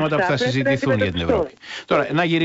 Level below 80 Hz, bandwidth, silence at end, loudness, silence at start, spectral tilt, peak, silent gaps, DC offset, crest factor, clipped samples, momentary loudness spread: -44 dBFS; 8 kHz; 0 s; -20 LUFS; 0 s; -6 dB/octave; -6 dBFS; none; under 0.1%; 14 dB; under 0.1%; 4 LU